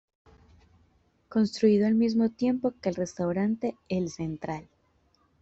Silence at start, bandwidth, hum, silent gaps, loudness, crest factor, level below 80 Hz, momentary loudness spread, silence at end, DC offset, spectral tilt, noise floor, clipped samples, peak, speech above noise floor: 1.3 s; 8 kHz; none; none; -28 LUFS; 18 dB; -62 dBFS; 11 LU; 0.8 s; under 0.1%; -7 dB/octave; -68 dBFS; under 0.1%; -12 dBFS; 41 dB